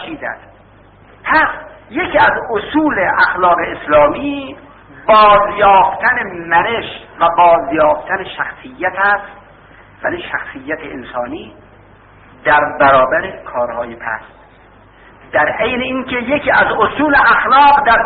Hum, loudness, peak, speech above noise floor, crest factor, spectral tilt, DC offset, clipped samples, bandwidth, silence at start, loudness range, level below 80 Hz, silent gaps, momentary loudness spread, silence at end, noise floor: none; -13 LUFS; 0 dBFS; 30 dB; 14 dB; -1.5 dB/octave; under 0.1%; under 0.1%; 4.9 kHz; 0 s; 8 LU; -42 dBFS; none; 15 LU; 0 s; -43 dBFS